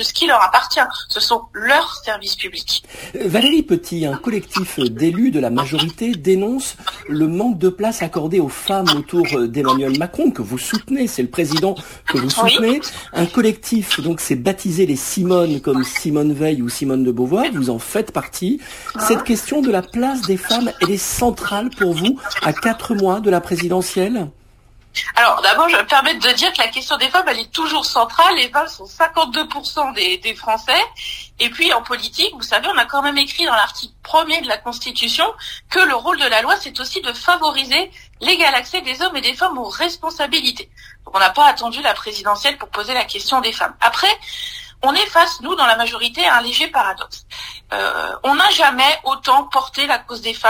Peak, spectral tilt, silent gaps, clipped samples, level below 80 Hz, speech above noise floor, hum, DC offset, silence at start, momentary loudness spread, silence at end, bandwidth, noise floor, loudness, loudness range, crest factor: 0 dBFS; -3.5 dB/octave; none; under 0.1%; -48 dBFS; 31 dB; none; under 0.1%; 0 s; 9 LU; 0 s; 16 kHz; -48 dBFS; -16 LUFS; 4 LU; 18 dB